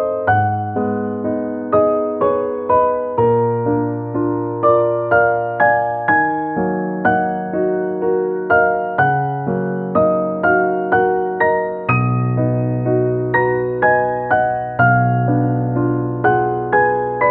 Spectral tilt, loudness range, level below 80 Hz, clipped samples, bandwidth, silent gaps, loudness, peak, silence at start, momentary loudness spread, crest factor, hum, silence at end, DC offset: -12.5 dB/octave; 1 LU; -48 dBFS; under 0.1%; 4 kHz; none; -17 LUFS; -2 dBFS; 0 s; 5 LU; 16 dB; none; 0 s; under 0.1%